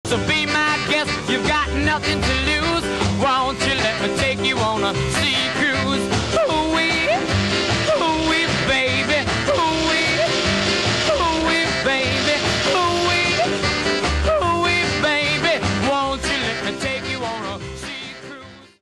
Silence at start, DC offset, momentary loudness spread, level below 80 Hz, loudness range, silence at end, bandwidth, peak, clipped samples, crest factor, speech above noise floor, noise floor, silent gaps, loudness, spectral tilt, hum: 0.05 s; 0.2%; 6 LU; -36 dBFS; 2 LU; 0.15 s; 12.5 kHz; -4 dBFS; under 0.1%; 14 dB; 20 dB; -40 dBFS; none; -18 LUFS; -4 dB/octave; none